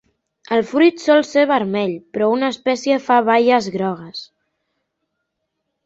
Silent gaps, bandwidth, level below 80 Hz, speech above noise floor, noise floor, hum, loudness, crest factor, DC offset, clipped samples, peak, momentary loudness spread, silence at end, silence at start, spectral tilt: none; 8 kHz; -66 dBFS; 59 dB; -75 dBFS; none; -17 LUFS; 16 dB; under 0.1%; under 0.1%; -2 dBFS; 10 LU; 1.6 s; 0.5 s; -5 dB/octave